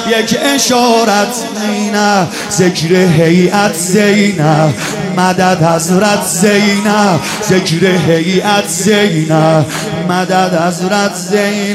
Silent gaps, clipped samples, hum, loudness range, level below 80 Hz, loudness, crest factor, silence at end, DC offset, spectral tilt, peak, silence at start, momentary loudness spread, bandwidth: none; under 0.1%; none; 1 LU; -50 dBFS; -11 LUFS; 10 dB; 0 s; under 0.1%; -4.5 dB/octave; 0 dBFS; 0 s; 5 LU; 16 kHz